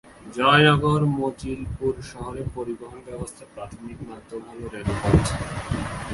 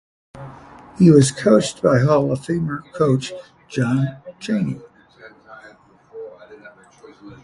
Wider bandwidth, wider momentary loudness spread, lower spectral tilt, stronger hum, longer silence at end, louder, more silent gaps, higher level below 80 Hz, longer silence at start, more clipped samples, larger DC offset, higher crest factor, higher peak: about the same, 11.5 kHz vs 11.5 kHz; second, 21 LU vs 25 LU; about the same, -5.5 dB/octave vs -6.5 dB/octave; neither; about the same, 0 s vs 0.1 s; second, -23 LUFS vs -18 LUFS; neither; first, -38 dBFS vs -54 dBFS; second, 0.05 s vs 0.35 s; neither; neither; about the same, 22 dB vs 20 dB; about the same, -2 dBFS vs 0 dBFS